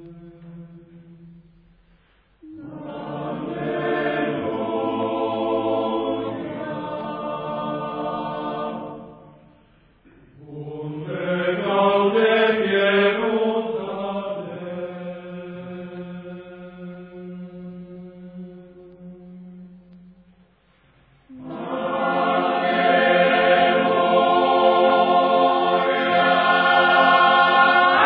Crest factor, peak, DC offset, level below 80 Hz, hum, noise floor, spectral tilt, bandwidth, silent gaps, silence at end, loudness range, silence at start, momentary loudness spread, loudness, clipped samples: 18 dB; -4 dBFS; under 0.1%; -60 dBFS; none; -59 dBFS; -8 dB/octave; 5.2 kHz; none; 0 s; 21 LU; 0 s; 22 LU; -20 LUFS; under 0.1%